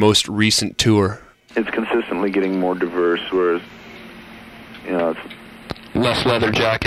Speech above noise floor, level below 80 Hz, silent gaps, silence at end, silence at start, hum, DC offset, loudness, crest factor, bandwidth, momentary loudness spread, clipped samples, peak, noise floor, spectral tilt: 21 dB; -46 dBFS; none; 0 s; 0 s; none; under 0.1%; -19 LUFS; 18 dB; 15 kHz; 22 LU; under 0.1%; -2 dBFS; -39 dBFS; -4.5 dB/octave